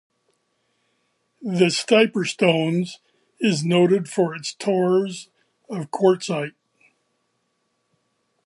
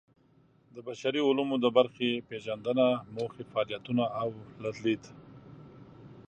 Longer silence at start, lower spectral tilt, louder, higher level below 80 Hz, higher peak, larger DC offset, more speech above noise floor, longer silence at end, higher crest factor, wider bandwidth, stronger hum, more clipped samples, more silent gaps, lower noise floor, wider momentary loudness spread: first, 1.4 s vs 0.75 s; about the same, -5.5 dB/octave vs -6 dB/octave; first, -21 LUFS vs -30 LUFS; about the same, -74 dBFS vs -70 dBFS; first, -2 dBFS vs -10 dBFS; neither; first, 52 dB vs 34 dB; first, 1.95 s vs 0.05 s; about the same, 22 dB vs 22 dB; first, 11.5 kHz vs 8.8 kHz; neither; neither; neither; first, -72 dBFS vs -64 dBFS; second, 14 LU vs 25 LU